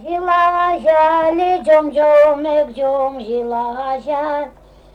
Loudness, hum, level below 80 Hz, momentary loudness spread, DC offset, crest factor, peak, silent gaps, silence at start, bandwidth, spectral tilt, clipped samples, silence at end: -15 LUFS; none; -48 dBFS; 10 LU; under 0.1%; 10 dB; -4 dBFS; none; 0 s; 8.8 kHz; -5.5 dB/octave; under 0.1%; 0.45 s